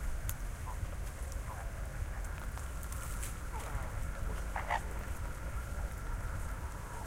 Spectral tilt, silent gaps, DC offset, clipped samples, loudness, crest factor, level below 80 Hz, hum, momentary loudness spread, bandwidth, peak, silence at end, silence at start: -4.5 dB/octave; none; under 0.1%; under 0.1%; -42 LUFS; 18 dB; -40 dBFS; none; 5 LU; 16.5 kHz; -20 dBFS; 0 s; 0 s